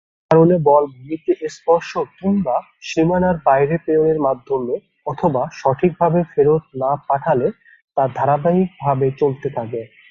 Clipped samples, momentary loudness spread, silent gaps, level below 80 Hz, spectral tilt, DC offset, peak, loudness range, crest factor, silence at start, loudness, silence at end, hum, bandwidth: under 0.1%; 10 LU; 7.84-7.88 s; -50 dBFS; -8 dB/octave; under 0.1%; -2 dBFS; 1 LU; 16 dB; 0.3 s; -18 LUFS; 0.25 s; none; 7.6 kHz